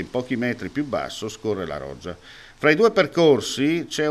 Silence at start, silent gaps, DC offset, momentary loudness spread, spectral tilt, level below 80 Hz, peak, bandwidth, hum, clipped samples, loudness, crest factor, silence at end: 0 s; none; under 0.1%; 16 LU; -5 dB/octave; -54 dBFS; -2 dBFS; 13 kHz; none; under 0.1%; -22 LUFS; 20 dB; 0 s